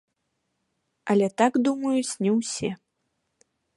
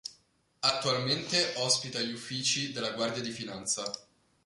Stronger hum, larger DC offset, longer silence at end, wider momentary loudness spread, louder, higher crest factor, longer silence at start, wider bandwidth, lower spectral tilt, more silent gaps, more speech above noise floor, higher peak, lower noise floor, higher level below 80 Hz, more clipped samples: neither; neither; first, 1 s vs 0.45 s; about the same, 11 LU vs 10 LU; first, -24 LUFS vs -30 LUFS; about the same, 20 dB vs 22 dB; first, 1.05 s vs 0.05 s; about the same, 11.5 kHz vs 11.5 kHz; first, -5 dB/octave vs -2 dB/octave; neither; first, 54 dB vs 35 dB; first, -6 dBFS vs -12 dBFS; first, -77 dBFS vs -67 dBFS; about the same, -70 dBFS vs -70 dBFS; neither